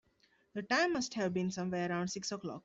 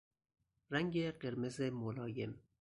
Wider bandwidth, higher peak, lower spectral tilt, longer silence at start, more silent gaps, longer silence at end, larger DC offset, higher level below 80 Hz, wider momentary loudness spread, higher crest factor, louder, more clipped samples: second, 8.2 kHz vs 11 kHz; about the same, -20 dBFS vs -22 dBFS; second, -4.5 dB/octave vs -6.5 dB/octave; second, 0.55 s vs 0.7 s; neither; second, 0.05 s vs 0.2 s; neither; about the same, -72 dBFS vs -70 dBFS; first, 9 LU vs 6 LU; about the same, 18 dB vs 20 dB; first, -35 LUFS vs -41 LUFS; neither